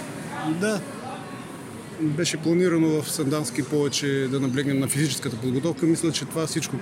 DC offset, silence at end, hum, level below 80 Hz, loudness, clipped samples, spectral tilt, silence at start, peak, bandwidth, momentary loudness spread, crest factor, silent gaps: under 0.1%; 0 s; none; -64 dBFS; -24 LUFS; under 0.1%; -5 dB/octave; 0 s; -8 dBFS; 16.5 kHz; 13 LU; 16 dB; none